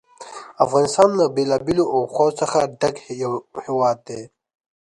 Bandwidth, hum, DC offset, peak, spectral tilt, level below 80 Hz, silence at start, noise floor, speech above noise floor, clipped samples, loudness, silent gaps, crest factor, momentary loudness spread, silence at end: 11.5 kHz; none; under 0.1%; 0 dBFS; -5 dB/octave; -58 dBFS; 0.2 s; -39 dBFS; 19 dB; under 0.1%; -20 LUFS; none; 20 dB; 18 LU; 0.6 s